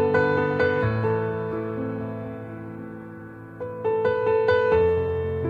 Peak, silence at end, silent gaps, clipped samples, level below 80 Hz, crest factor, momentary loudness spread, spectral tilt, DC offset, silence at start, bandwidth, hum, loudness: -8 dBFS; 0 s; none; under 0.1%; -48 dBFS; 16 dB; 17 LU; -8.5 dB/octave; under 0.1%; 0 s; 4.9 kHz; none; -23 LUFS